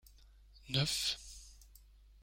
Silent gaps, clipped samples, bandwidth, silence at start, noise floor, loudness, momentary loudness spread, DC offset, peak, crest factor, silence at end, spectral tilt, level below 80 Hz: none; under 0.1%; 16.5 kHz; 0.25 s; -61 dBFS; -35 LUFS; 21 LU; under 0.1%; -20 dBFS; 22 dB; 0.4 s; -3 dB/octave; -58 dBFS